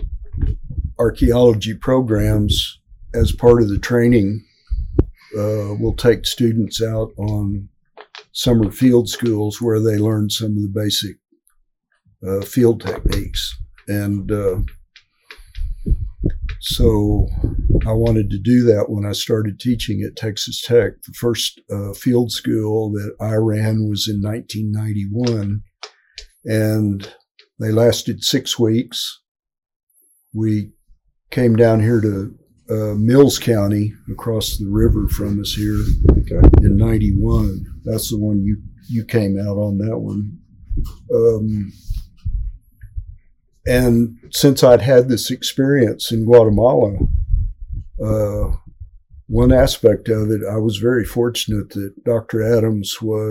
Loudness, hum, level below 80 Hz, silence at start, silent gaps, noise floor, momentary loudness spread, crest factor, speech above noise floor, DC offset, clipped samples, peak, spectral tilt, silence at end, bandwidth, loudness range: -17 LUFS; none; -26 dBFS; 0 s; 27.31-27.35 s, 29.28-29.35 s, 29.76-29.87 s; -63 dBFS; 15 LU; 16 dB; 47 dB; under 0.1%; under 0.1%; 0 dBFS; -6 dB/octave; 0 s; 16.5 kHz; 6 LU